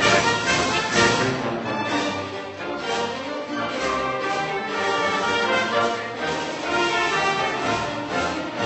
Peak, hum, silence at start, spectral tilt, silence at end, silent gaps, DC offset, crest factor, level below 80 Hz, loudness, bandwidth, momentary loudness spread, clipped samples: -4 dBFS; none; 0 s; -3 dB/octave; 0 s; none; under 0.1%; 18 dB; -52 dBFS; -23 LUFS; 8.4 kHz; 9 LU; under 0.1%